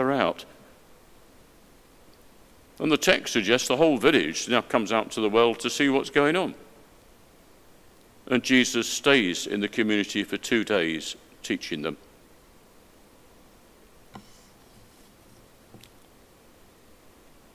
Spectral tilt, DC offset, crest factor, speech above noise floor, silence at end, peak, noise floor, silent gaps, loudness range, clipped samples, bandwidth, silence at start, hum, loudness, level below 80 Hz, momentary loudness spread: -3.5 dB/octave; under 0.1%; 26 dB; 31 dB; 3.35 s; -2 dBFS; -55 dBFS; none; 9 LU; under 0.1%; 16 kHz; 0 s; none; -24 LUFS; -62 dBFS; 11 LU